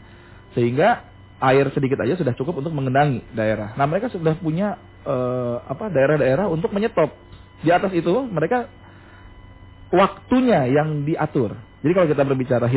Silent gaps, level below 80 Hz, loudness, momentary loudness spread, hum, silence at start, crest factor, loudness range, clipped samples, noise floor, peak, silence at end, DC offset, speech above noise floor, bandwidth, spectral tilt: none; -48 dBFS; -21 LUFS; 8 LU; none; 0.35 s; 16 dB; 2 LU; under 0.1%; -44 dBFS; -4 dBFS; 0 s; under 0.1%; 25 dB; 4 kHz; -11.5 dB/octave